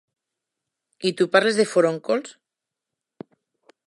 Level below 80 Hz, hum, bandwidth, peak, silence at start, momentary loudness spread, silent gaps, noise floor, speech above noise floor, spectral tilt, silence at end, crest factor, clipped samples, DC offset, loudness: -80 dBFS; none; 11.5 kHz; -2 dBFS; 1 s; 9 LU; none; -86 dBFS; 65 dB; -4.5 dB/octave; 1.55 s; 22 dB; under 0.1%; under 0.1%; -21 LUFS